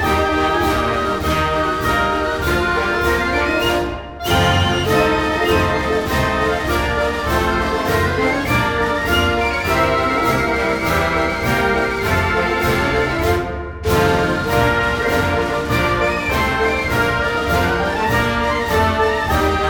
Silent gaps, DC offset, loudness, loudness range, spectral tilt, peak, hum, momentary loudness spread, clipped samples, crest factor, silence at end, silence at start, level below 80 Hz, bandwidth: none; under 0.1%; -17 LUFS; 1 LU; -5 dB/octave; -4 dBFS; none; 3 LU; under 0.1%; 14 dB; 0 s; 0 s; -30 dBFS; over 20 kHz